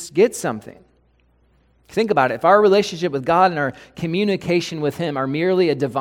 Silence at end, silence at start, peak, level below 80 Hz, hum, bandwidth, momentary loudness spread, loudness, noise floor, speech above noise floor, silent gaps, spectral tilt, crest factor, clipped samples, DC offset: 0 s; 0 s; 0 dBFS; -56 dBFS; none; 16 kHz; 12 LU; -19 LUFS; -59 dBFS; 40 dB; none; -5.5 dB/octave; 20 dB; under 0.1%; under 0.1%